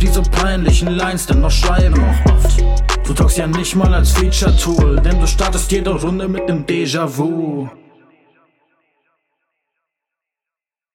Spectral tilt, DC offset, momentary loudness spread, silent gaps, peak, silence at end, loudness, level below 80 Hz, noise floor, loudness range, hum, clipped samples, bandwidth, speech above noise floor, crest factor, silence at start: -5 dB/octave; under 0.1%; 6 LU; none; -2 dBFS; 3.25 s; -15 LUFS; -16 dBFS; -88 dBFS; 9 LU; none; under 0.1%; 16.5 kHz; 75 dB; 12 dB; 0 s